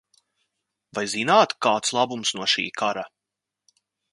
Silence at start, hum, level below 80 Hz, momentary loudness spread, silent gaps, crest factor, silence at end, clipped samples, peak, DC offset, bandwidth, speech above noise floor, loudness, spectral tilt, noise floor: 0.95 s; none; -72 dBFS; 13 LU; none; 22 dB; 1.05 s; under 0.1%; -4 dBFS; under 0.1%; 11.5 kHz; 63 dB; -22 LUFS; -2.5 dB/octave; -86 dBFS